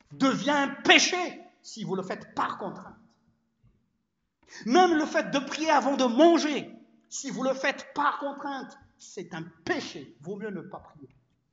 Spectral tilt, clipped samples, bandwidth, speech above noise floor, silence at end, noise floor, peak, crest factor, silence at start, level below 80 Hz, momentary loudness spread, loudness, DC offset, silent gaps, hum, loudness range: -3 dB/octave; under 0.1%; 8 kHz; 52 dB; 0.45 s; -79 dBFS; -4 dBFS; 24 dB; 0.1 s; -72 dBFS; 22 LU; -26 LUFS; under 0.1%; none; none; 12 LU